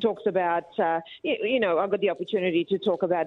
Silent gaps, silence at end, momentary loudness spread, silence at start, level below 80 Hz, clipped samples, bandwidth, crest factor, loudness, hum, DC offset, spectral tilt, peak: none; 0 s; 3 LU; 0 s; -70 dBFS; under 0.1%; 4.5 kHz; 14 dB; -26 LUFS; none; under 0.1%; -7.5 dB/octave; -10 dBFS